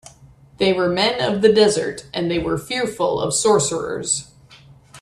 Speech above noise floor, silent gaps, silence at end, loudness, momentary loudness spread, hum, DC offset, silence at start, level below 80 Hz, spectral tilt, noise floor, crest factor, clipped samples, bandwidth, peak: 29 dB; none; 0 s; -19 LUFS; 8 LU; none; under 0.1%; 0.6 s; -50 dBFS; -3.5 dB/octave; -48 dBFS; 18 dB; under 0.1%; 13 kHz; -2 dBFS